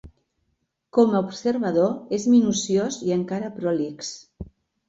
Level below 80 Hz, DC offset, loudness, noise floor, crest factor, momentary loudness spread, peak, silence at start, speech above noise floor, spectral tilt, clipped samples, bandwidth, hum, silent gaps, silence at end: -54 dBFS; under 0.1%; -23 LUFS; -74 dBFS; 18 dB; 17 LU; -6 dBFS; 0.05 s; 52 dB; -5.5 dB/octave; under 0.1%; 8 kHz; none; none; 0.45 s